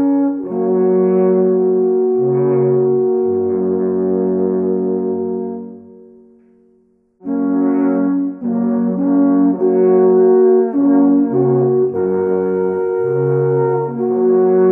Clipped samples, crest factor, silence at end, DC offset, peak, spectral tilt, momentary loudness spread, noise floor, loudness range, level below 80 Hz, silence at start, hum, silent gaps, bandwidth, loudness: under 0.1%; 12 dB; 0 s; under 0.1%; -2 dBFS; -13.5 dB/octave; 7 LU; -55 dBFS; 8 LU; -66 dBFS; 0 s; none; none; 2.5 kHz; -15 LUFS